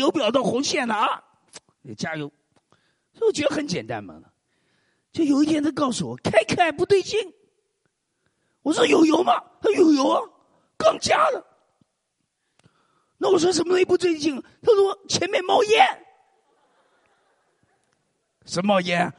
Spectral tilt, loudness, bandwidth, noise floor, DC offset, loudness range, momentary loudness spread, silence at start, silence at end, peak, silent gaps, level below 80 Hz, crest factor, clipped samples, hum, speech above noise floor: -4 dB/octave; -21 LUFS; 11.5 kHz; -76 dBFS; under 0.1%; 7 LU; 13 LU; 0 s; 0.05 s; -2 dBFS; none; -64 dBFS; 22 dB; under 0.1%; none; 55 dB